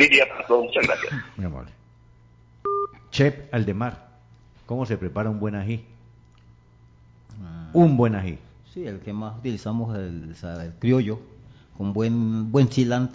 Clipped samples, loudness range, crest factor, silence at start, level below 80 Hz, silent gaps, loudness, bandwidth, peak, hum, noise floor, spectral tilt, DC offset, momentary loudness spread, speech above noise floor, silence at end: under 0.1%; 6 LU; 20 dB; 0 s; -48 dBFS; none; -24 LUFS; 7.8 kHz; -4 dBFS; none; -53 dBFS; -6.5 dB/octave; under 0.1%; 17 LU; 30 dB; 0 s